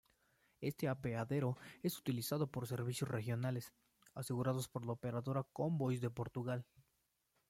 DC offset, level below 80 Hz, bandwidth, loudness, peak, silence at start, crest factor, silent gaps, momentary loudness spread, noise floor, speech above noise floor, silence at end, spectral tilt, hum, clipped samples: under 0.1%; -72 dBFS; 16.5 kHz; -42 LUFS; -24 dBFS; 0.6 s; 18 dB; none; 7 LU; -83 dBFS; 42 dB; 0.85 s; -6.5 dB/octave; none; under 0.1%